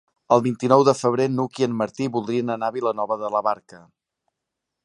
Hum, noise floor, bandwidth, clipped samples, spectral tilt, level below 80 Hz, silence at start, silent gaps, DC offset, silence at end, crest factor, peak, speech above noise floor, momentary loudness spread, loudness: none; -83 dBFS; 11.5 kHz; under 0.1%; -6.5 dB/octave; -68 dBFS; 0.3 s; none; under 0.1%; 1.1 s; 22 dB; -2 dBFS; 61 dB; 9 LU; -22 LUFS